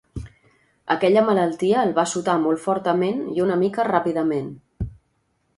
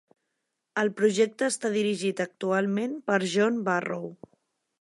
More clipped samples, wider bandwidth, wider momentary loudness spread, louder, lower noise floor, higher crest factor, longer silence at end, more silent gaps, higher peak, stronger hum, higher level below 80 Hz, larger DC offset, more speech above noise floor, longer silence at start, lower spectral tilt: neither; about the same, 11.5 kHz vs 11.5 kHz; first, 16 LU vs 8 LU; first, -21 LUFS vs -27 LUFS; second, -68 dBFS vs -81 dBFS; about the same, 20 dB vs 18 dB; about the same, 0.65 s vs 0.7 s; neither; first, -2 dBFS vs -10 dBFS; neither; first, -46 dBFS vs -80 dBFS; neither; second, 48 dB vs 55 dB; second, 0.15 s vs 0.75 s; about the same, -5.5 dB/octave vs -4.5 dB/octave